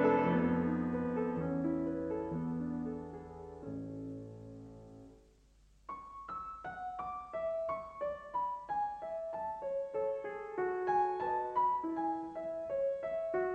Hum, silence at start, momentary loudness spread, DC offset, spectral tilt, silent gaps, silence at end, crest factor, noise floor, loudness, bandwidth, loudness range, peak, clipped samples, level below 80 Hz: none; 0 s; 15 LU; under 0.1%; -9 dB/octave; none; 0 s; 18 dB; -65 dBFS; -37 LUFS; 8.4 kHz; 12 LU; -18 dBFS; under 0.1%; -64 dBFS